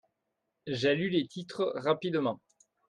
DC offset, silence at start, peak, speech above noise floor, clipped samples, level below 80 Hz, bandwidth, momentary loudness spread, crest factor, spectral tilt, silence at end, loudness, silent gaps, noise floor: under 0.1%; 0.65 s; -14 dBFS; 53 dB; under 0.1%; -74 dBFS; 10.5 kHz; 11 LU; 18 dB; -6 dB/octave; 0.55 s; -31 LUFS; none; -83 dBFS